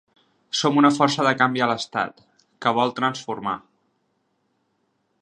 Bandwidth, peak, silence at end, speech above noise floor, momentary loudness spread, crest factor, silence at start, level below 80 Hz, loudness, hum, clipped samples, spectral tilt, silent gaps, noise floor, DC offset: 9.8 kHz; -2 dBFS; 1.65 s; 49 dB; 11 LU; 22 dB; 0.55 s; -70 dBFS; -21 LUFS; none; under 0.1%; -4.5 dB/octave; none; -71 dBFS; under 0.1%